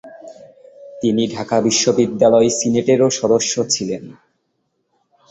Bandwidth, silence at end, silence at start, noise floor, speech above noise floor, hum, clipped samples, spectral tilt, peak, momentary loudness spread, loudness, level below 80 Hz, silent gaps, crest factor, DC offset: 8.2 kHz; 1.2 s; 0.05 s; -69 dBFS; 53 dB; none; under 0.1%; -4 dB/octave; 0 dBFS; 7 LU; -16 LUFS; -56 dBFS; none; 18 dB; under 0.1%